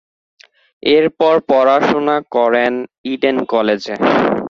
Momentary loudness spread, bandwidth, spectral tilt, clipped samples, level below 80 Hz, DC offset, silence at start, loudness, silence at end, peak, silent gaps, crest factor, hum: 6 LU; 7.2 kHz; -6 dB/octave; under 0.1%; -56 dBFS; under 0.1%; 0.85 s; -15 LUFS; 0 s; -2 dBFS; 2.98-3.04 s; 14 dB; none